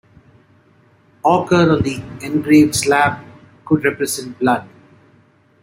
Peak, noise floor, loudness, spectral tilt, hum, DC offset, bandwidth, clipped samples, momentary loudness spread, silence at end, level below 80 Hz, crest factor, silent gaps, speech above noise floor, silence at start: -2 dBFS; -53 dBFS; -16 LUFS; -5 dB/octave; none; under 0.1%; 16 kHz; under 0.1%; 10 LU; 1 s; -48 dBFS; 16 dB; none; 38 dB; 1.25 s